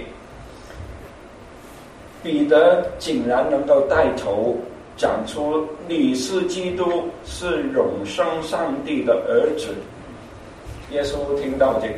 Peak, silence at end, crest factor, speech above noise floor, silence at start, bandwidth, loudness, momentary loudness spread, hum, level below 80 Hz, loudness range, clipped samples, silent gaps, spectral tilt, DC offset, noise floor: -2 dBFS; 0 s; 20 dB; 21 dB; 0 s; 13 kHz; -21 LUFS; 23 LU; none; -44 dBFS; 4 LU; under 0.1%; none; -5 dB/octave; under 0.1%; -41 dBFS